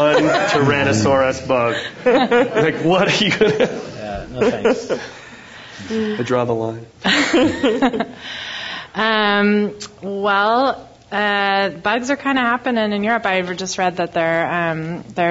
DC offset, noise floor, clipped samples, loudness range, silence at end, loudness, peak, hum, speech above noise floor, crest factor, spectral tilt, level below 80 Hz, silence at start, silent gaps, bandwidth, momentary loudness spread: under 0.1%; -38 dBFS; under 0.1%; 4 LU; 0 s; -18 LUFS; -2 dBFS; none; 21 dB; 16 dB; -4.5 dB/octave; -50 dBFS; 0 s; none; 8 kHz; 12 LU